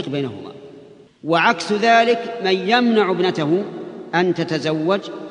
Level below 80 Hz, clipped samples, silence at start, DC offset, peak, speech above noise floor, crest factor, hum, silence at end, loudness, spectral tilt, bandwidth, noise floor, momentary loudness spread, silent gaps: -68 dBFS; under 0.1%; 0 s; under 0.1%; 0 dBFS; 26 dB; 18 dB; none; 0 s; -18 LUFS; -5.5 dB/octave; 10.5 kHz; -44 dBFS; 14 LU; none